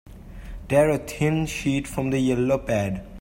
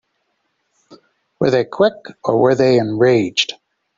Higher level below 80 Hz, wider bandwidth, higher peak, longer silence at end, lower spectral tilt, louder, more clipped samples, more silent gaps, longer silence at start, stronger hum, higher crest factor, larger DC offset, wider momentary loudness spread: first, -42 dBFS vs -58 dBFS; first, 16.5 kHz vs 7.6 kHz; second, -6 dBFS vs -2 dBFS; second, 0 s vs 0.45 s; about the same, -6.5 dB/octave vs -5.5 dB/octave; second, -23 LUFS vs -16 LUFS; neither; neither; second, 0.05 s vs 0.9 s; neither; about the same, 18 dB vs 16 dB; neither; first, 13 LU vs 7 LU